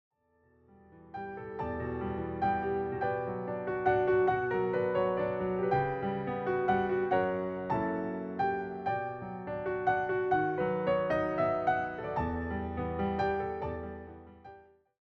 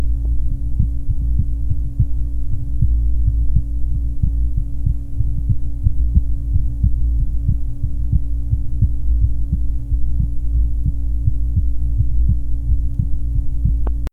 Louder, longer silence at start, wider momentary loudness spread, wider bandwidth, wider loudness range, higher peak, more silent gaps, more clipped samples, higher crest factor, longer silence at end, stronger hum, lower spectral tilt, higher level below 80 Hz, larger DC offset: second, -32 LUFS vs -21 LUFS; first, 0.9 s vs 0 s; first, 10 LU vs 4 LU; first, 6 kHz vs 1.2 kHz; first, 5 LU vs 1 LU; second, -16 dBFS vs 0 dBFS; neither; neither; about the same, 16 dB vs 14 dB; first, 0.4 s vs 0.05 s; neither; second, -9 dB/octave vs -10.5 dB/octave; second, -56 dBFS vs -18 dBFS; neither